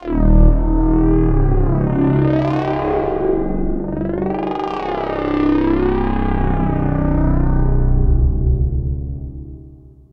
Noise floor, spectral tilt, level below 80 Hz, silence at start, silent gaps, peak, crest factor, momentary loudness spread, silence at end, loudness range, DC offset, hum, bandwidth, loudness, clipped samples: -41 dBFS; -10.5 dB/octave; -18 dBFS; 0 s; none; 0 dBFS; 14 dB; 7 LU; 0.25 s; 3 LU; under 0.1%; none; 4.7 kHz; -18 LUFS; under 0.1%